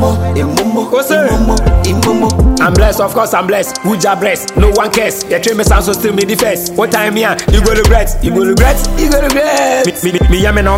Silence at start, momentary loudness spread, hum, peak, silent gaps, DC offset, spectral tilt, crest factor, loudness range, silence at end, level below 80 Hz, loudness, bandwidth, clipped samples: 0 s; 4 LU; none; 0 dBFS; none; under 0.1%; -5 dB/octave; 10 dB; 1 LU; 0 s; -16 dBFS; -11 LUFS; 16.5 kHz; 0.3%